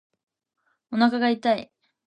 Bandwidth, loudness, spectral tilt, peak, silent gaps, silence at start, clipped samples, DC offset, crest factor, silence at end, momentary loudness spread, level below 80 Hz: 8.2 kHz; -23 LUFS; -6 dB/octave; -6 dBFS; none; 0.9 s; under 0.1%; under 0.1%; 20 dB; 0.5 s; 7 LU; -72 dBFS